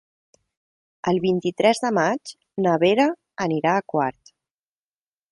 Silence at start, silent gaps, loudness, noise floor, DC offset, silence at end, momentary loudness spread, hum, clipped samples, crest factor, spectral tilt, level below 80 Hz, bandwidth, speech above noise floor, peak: 1.05 s; none; -22 LUFS; under -90 dBFS; under 0.1%; 1.2 s; 10 LU; none; under 0.1%; 20 dB; -5.5 dB/octave; -64 dBFS; 11.5 kHz; over 69 dB; -4 dBFS